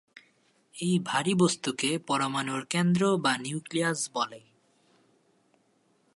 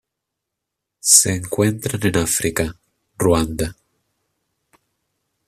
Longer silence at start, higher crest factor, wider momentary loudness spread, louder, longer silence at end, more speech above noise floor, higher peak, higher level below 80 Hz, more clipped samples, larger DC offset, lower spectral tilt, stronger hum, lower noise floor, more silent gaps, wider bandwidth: second, 0.75 s vs 1.05 s; about the same, 20 dB vs 22 dB; second, 8 LU vs 13 LU; second, -28 LUFS vs -17 LUFS; about the same, 1.75 s vs 1.75 s; second, 41 dB vs 63 dB; second, -10 dBFS vs 0 dBFS; second, -74 dBFS vs -42 dBFS; neither; neither; about the same, -4.5 dB/octave vs -3.5 dB/octave; neither; second, -69 dBFS vs -81 dBFS; neither; second, 11.5 kHz vs 15 kHz